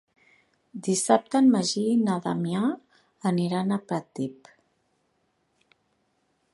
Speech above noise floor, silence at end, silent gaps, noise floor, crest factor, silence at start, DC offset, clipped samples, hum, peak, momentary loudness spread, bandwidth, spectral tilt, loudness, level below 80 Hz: 47 dB; 2.2 s; none; -72 dBFS; 22 dB; 0.75 s; under 0.1%; under 0.1%; none; -4 dBFS; 14 LU; 11.5 kHz; -5.5 dB/octave; -25 LUFS; -74 dBFS